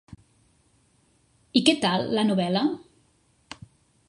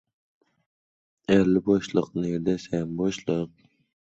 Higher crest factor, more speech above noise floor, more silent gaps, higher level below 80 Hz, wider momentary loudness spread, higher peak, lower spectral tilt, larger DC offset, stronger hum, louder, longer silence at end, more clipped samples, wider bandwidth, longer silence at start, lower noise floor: about the same, 24 dB vs 20 dB; second, 42 dB vs over 66 dB; neither; second, -64 dBFS vs -56 dBFS; first, 24 LU vs 9 LU; about the same, -4 dBFS vs -6 dBFS; second, -5 dB/octave vs -7 dB/octave; neither; neither; about the same, -23 LUFS vs -25 LUFS; first, 1.3 s vs 0.6 s; neither; first, 11.5 kHz vs 8 kHz; second, 0.1 s vs 1.3 s; second, -64 dBFS vs under -90 dBFS